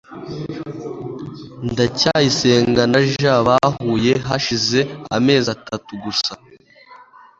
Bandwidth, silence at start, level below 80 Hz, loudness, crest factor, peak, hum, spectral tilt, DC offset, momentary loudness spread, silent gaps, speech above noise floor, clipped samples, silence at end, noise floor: 7.8 kHz; 0.1 s; -48 dBFS; -17 LUFS; 18 dB; -2 dBFS; none; -5 dB/octave; under 0.1%; 15 LU; none; 28 dB; under 0.1%; 0.35 s; -45 dBFS